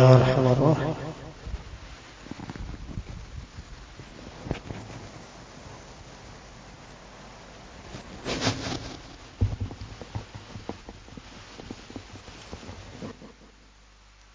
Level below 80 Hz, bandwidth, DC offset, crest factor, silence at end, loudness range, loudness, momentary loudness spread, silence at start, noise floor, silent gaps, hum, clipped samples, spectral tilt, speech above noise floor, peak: -44 dBFS; 7.6 kHz; under 0.1%; 28 dB; 1.05 s; 12 LU; -29 LUFS; 20 LU; 0 s; -54 dBFS; none; none; under 0.1%; -6.5 dB/octave; 35 dB; -2 dBFS